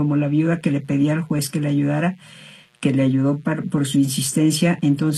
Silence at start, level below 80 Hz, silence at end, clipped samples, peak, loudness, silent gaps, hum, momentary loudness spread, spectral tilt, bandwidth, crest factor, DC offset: 0 s; -60 dBFS; 0 s; under 0.1%; -6 dBFS; -20 LUFS; none; none; 5 LU; -6 dB/octave; 13 kHz; 14 dB; under 0.1%